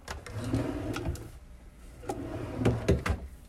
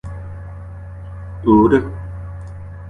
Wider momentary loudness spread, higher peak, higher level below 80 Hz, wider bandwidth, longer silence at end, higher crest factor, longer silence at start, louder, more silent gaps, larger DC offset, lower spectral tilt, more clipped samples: about the same, 23 LU vs 21 LU; second, -12 dBFS vs -2 dBFS; second, -42 dBFS vs -34 dBFS; first, 15 kHz vs 3.8 kHz; about the same, 0 s vs 0 s; about the same, 20 dB vs 18 dB; about the same, 0 s vs 0.05 s; second, -33 LUFS vs -15 LUFS; neither; neither; second, -6.5 dB/octave vs -9.5 dB/octave; neither